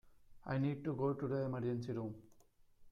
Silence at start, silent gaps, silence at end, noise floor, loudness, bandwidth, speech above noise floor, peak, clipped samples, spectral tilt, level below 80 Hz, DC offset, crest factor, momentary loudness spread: 0.05 s; none; 0 s; -67 dBFS; -40 LUFS; 7 kHz; 28 dB; -26 dBFS; under 0.1%; -9.5 dB/octave; -70 dBFS; under 0.1%; 14 dB; 10 LU